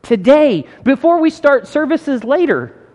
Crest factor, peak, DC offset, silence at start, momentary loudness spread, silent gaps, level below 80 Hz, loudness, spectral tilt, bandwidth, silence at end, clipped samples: 14 dB; 0 dBFS; under 0.1%; 0.05 s; 7 LU; none; -54 dBFS; -13 LUFS; -6.5 dB/octave; 10.5 kHz; 0.25 s; under 0.1%